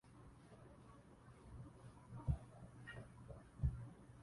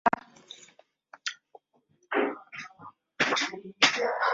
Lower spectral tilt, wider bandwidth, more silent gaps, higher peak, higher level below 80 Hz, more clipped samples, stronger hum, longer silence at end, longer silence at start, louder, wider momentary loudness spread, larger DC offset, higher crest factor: first, -8 dB/octave vs -1.5 dB/octave; first, 11.5 kHz vs 7.8 kHz; neither; second, -28 dBFS vs -4 dBFS; first, -54 dBFS vs -74 dBFS; neither; neither; about the same, 0 s vs 0 s; about the same, 0.05 s vs 0.05 s; second, -50 LUFS vs -28 LUFS; second, 18 LU vs 25 LU; neither; about the same, 24 dB vs 28 dB